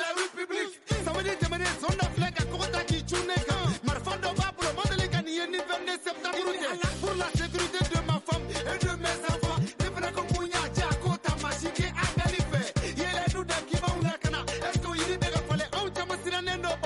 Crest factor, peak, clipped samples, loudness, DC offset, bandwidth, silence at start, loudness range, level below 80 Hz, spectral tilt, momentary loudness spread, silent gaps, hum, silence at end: 14 dB; -16 dBFS; under 0.1%; -30 LUFS; under 0.1%; 11.5 kHz; 0 s; 1 LU; -40 dBFS; -4.5 dB/octave; 3 LU; none; none; 0 s